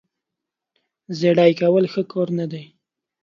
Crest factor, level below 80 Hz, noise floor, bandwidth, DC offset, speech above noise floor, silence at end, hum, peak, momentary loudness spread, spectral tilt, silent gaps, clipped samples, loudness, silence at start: 18 dB; -70 dBFS; -84 dBFS; 7.2 kHz; under 0.1%; 66 dB; 0.6 s; none; -2 dBFS; 16 LU; -7.5 dB/octave; none; under 0.1%; -19 LUFS; 1.1 s